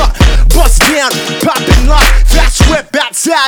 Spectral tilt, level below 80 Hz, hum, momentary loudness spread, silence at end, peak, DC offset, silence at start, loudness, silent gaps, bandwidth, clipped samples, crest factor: -3.5 dB/octave; -8 dBFS; none; 5 LU; 0 s; 0 dBFS; under 0.1%; 0 s; -9 LUFS; none; 19.5 kHz; 0.9%; 6 dB